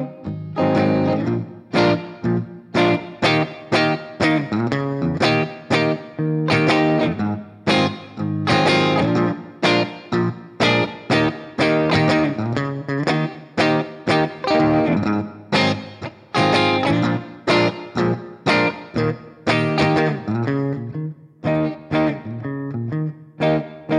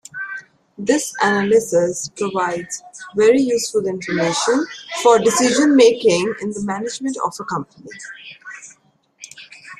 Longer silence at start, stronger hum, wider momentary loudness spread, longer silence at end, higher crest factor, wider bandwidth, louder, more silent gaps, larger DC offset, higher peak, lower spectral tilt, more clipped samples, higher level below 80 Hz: second, 0 s vs 0.15 s; neither; second, 9 LU vs 22 LU; about the same, 0 s vs 0.05 s; about the same, 16 dB vs 18 dB; second, 11 kHz vs 13.5 kHz; about the same, -20 LUFS vs -18 LUFS; neither; neither; about the same, -4 dBFS vs -2 dBFS; first, -6.5 dB/octave vs -3.5 dB/octave; neither; first, -52 dBFS vs -62 dBFS